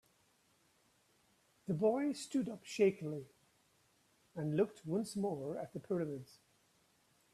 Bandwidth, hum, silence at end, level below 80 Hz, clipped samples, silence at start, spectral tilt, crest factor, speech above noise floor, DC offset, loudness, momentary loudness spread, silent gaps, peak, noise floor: 13.5 kHz; none; 1.1 s; -80 dBFS; under 0.1%; 1.65 s; -6.5 dB/octave; 20 dB; 37 dB; under 0.1%; -38 LUFS; 12 LU; none; -20 dBFS; -74 dBFS